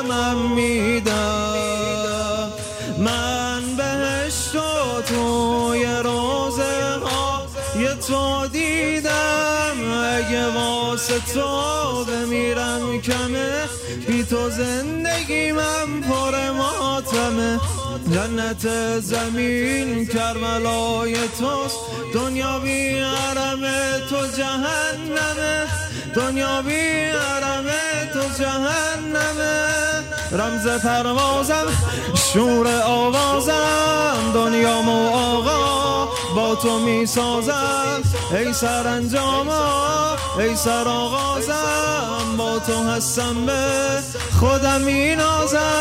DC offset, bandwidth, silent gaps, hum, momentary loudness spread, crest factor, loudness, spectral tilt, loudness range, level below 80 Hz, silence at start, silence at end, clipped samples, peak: under 0.1%; 16 kHz; none; none; 5 LU; 16 dB; -20 LUFS; -3.5 dB/octave; 4 LU; -40 dBFS; 0 s; 0 s; under 0.1%; -4 dBFS